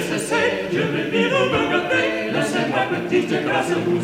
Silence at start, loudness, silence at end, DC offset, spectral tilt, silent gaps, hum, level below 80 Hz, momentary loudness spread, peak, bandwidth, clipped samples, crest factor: 0 s; -20 LUFS; 0 s; under 0.1%; -5 dB/octave; none; none; -54 dBFS; 3 LU; -6 dBFS; 15.5 kHz; under 0.1%; 14 dB